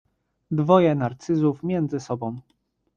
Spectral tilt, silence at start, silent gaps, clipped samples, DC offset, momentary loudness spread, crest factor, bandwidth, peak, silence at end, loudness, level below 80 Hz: -8 dB/octave; 0.5 s; none; under 0.1%; under 0.1%; 12 LU; 20 dB; 7.4 kHz; -4 dBFS; 0.55 s; -23 LUFS; -62 dBFS